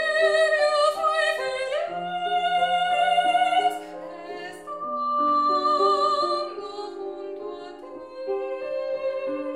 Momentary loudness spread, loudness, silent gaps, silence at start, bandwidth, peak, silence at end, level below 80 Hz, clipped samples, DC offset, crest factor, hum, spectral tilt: 16 LU; -23 LUFS; none; 0 s; 13.5 kHz; -10 dBFS; 0 s; -70 dBFS; under 0.1%; under 0.1%; 16 dB; none; -2.5 dB/octave